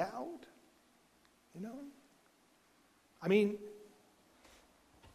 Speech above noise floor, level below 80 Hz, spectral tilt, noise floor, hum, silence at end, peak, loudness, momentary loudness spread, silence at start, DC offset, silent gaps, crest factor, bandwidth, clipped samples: 34 dB; -78 dBFS; -6.5 dB/octave; -70 dBFS; none; 0.05 s; -16 dBFS; -37 LUFS; 26 LU; 0 s; under 0.1%; none; 24 dB; 14.5 kHz; under 0.1%